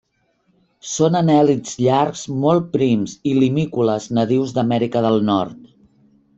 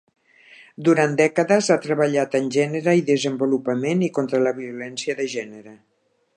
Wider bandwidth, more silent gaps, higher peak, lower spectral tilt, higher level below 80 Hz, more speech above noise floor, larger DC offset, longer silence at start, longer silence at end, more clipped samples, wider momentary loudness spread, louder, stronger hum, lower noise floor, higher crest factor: second, 8.2 kHz vs 11 kHz; neither; about the same, -4 dBFS vs -4 dBFS; about the same, -6.5 dB/octave vs -5.5 dB/octave; first, -58 dBFS vs -74 dBFS; first, 47 dB vs 29 dB; neither; about the same, 0.85 s vs 0.8 s; about the same, 0.7 s vs 0.6 s; neither; second, 6 LU vs 10 LU; first, -18 LUFS vs -21 LUFS; neither; first, -64 dBFS vs -50 dBFS; about the same, 16 dB vs 18 dB